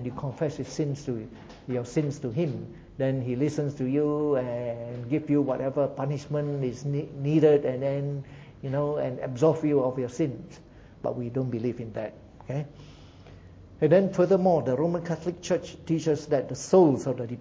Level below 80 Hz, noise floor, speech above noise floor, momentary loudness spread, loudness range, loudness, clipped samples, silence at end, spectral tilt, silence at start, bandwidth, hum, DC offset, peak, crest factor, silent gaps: -56 dBFS; -48 dBFS; 22 dB; 14 LU; 6 LU; -27 LUFS; under 0.1%; 0 s; -7.5 dB/octave; 0 s; 8 kHz; none; under 0.1%; -8 dBFS; 20 dB; none